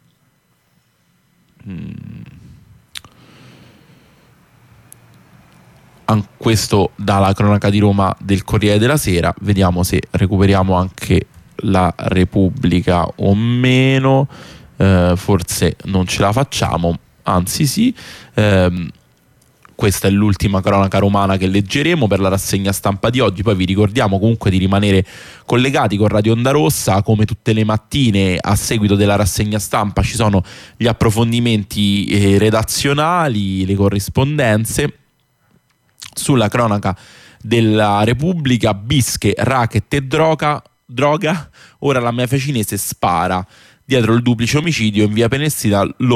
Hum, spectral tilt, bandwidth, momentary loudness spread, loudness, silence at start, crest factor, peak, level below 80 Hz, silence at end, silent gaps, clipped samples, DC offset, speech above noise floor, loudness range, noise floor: none; -5.5 dB/octave; 15.5 kHz; 7 LU; -15 LUFS; 1.65 s; 12 dB; -2 dBFS; -36 dBFS; 0 s; none; under 0.1%; under 0.1%; 45 dB; 3 LU; -59 dBFS